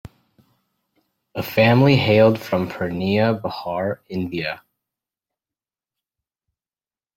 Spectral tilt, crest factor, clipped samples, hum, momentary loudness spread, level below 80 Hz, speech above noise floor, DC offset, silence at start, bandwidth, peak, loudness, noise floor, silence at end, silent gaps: -7.5 dB/octave; 20 dB; under 0.1%; none; 14 LU; -56 dBFS; over 71 dB; under 0.1%; 0.05 s; 16.5 kHz; -2 dBFS; -19 LUFS; under -90 dBFS; 2.6 s; none